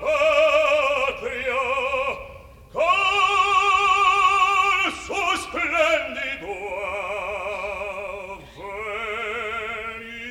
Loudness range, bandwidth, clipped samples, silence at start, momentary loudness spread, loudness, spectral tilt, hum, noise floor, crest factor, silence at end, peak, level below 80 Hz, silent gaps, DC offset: 10 LU; 15.5 kHz; under 0.1%; 0 s; 15 LU; -21 LUFS; -2 dB/octave; none; -43 dBFS; 16 dB; 0 s; -8 dBFS; -50 dBFS; none; under 0.1%